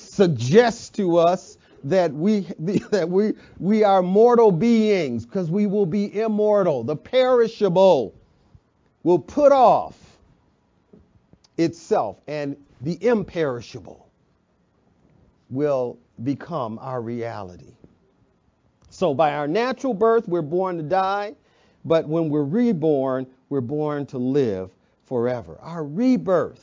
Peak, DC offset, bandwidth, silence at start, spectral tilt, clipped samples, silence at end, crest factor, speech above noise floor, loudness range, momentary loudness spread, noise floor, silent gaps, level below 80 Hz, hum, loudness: -2 dBFS; under 0.1%; 7.6 kHz; 0 s; -7 dB/octave; under 0.1%; 0.1 s; 18 dB; 44 dB; 10 LU; 14 LU; -64 dBFS; none; -60 dBFS; none; -21 LUFS